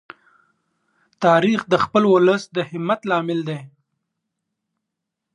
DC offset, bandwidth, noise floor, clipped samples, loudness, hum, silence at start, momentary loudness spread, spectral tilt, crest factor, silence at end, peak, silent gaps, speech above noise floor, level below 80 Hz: under 0.1%; 10 kHz; -81 dBFS; under 0.1%; -19 LUFS; none; 1.2 s; 11 LU; -6.5 dB/octave; 18 dB; 1.65 s; -2 dBFS; none; 63 dB; -64 dBFS